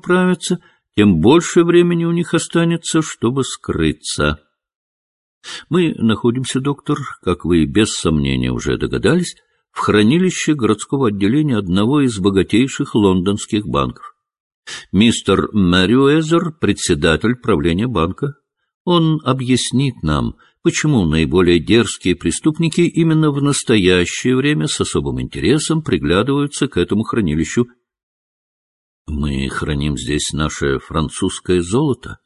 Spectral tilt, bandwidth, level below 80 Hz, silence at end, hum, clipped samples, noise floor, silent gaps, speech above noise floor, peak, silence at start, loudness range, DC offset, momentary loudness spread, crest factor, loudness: -5.5 dB/octave; 11.5 kHz; -34 dBFS; 0.1 s; none; under 0.1%; under -90 dBFS; 4.75-5.41 s, 14.40-14.63 s, 18.74-18.85 s, 28.03-29.05 s; over 74 dB; 0 dBFS; 0.05 s; 5 LU; 0.1%; 8 LU; 16 dB; -16 LUFS